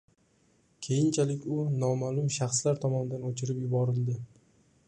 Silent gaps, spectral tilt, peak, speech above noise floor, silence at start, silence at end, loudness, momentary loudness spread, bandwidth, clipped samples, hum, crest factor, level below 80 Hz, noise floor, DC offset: none; -6 dB/octave; -14 dBFS; 38 dB; 0.8 s; 0.65 s; -30 LUFS; 7 LU; 11 kHz; under 0.1%; none; 16 dB; -68 dBFS; -67 dBFS; under 0.1%